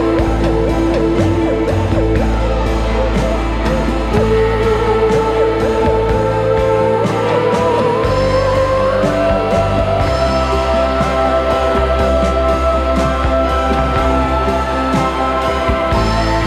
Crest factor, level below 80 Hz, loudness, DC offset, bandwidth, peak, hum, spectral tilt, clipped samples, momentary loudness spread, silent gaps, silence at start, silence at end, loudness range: 12 dB; -20 dBFS; -14 LUFS; under 0.1%; 12.5 kHz; -2 dBFS; none; -6.5 dB/octave; under 0.1%; 2 LU; none; 0 s; 0 s; 1 LU